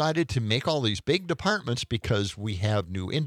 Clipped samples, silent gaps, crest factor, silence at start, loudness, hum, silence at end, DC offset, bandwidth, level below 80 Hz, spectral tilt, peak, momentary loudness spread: under 0.1%; none; 18 dB; 0 s; -27 LUFS; none; 0 s; under 0.1%; 14 kHz; -52 dBFS; -5.5 dB/octave; -10 dBFS; 4 LU